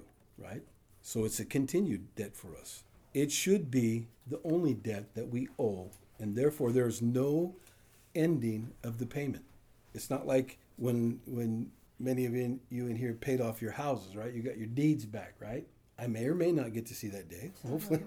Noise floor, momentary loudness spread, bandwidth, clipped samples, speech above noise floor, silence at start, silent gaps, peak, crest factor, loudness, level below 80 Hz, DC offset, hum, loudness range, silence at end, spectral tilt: -62 dBFS; 15 LU; over 20 kHz; under 0.1%; 28 dB; 0 s; none; -16 dBFS; 18 dB; -35 LUFS; -66 dBFS; under 0.1%; none; 3 LU; 0 s; -6 dB/octave